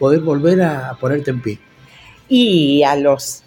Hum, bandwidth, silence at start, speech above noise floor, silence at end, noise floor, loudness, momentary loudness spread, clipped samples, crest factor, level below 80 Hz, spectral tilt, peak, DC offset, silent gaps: none; 17 kHz; 0 s; 29 dB; 0.1 s; -43 dBFS; -15 LUFS; 10 LU; under 0.1%; 14 dB; -54 dBFS; -5.5 dB/octave; -2 dBFS; under 0.1%; none